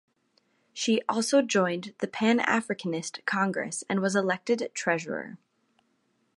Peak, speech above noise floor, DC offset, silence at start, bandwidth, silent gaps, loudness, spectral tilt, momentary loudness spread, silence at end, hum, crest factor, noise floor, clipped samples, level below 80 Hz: -10 dBFS; 45 dB; under 0.1%; 0.75 s; 11.5 kHz; none; -27 LUFS; -4 dB/octave; 10 LU; 1 s; none; 20 dB; -72 dBFS; under 0.1%; -78 dBFS